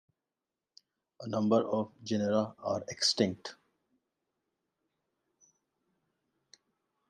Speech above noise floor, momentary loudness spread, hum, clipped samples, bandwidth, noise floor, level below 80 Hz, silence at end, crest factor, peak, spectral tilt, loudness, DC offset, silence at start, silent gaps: over 59 dB; 13 LU; none; under 0.1%; 12 kHz; under -90 dBFS; -80 dBFS; 3.55 s; 24 dB; -12 dBFS; -4.5 dB/octave; -31 LUFS; under 0.1%; 1.2 s; none